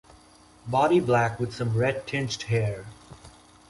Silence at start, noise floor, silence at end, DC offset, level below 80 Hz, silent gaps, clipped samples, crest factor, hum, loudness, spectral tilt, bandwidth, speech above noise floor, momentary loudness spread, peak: 0.65 s; -54 dBFS; 0.4 s; under 0.1%; -54 dBFS; none; under 0.1%; 18 dB; none; -25 LUFS; -6 dB/octave; 11.5 kHz; 29 dB; 14 LU; -10 dBFS